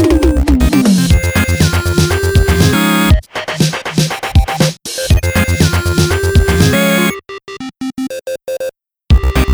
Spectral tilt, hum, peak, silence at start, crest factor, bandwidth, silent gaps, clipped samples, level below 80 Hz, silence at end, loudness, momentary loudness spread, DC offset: -5 dB/octave; none; 0 dBFS; 0 s; 12 dB; over 20 kHz; none; under 0.1%; -18 dBFS; 0 s; -12 LUFS; 12 LU; under 0.1%